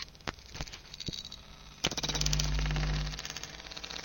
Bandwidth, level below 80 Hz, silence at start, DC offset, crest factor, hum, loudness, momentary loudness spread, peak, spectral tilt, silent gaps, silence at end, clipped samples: 17 kHz; -40 dBFS; 0 s; under 0.1%; 26 dB; none; -35 LUFS; 13 LU; -8 dBFS; -3 dB/octave; none; 0 s; under 0.1%